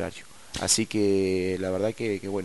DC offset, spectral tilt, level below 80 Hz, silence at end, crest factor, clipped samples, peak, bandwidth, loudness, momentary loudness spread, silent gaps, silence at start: 0.4%; -3.5 dB/octave; -56 dBFS; 0 s; 18 dB; under 0.1%; -8 dBFS; 11.5 kHz; -26 LUFS; 13 LU; none; 0 s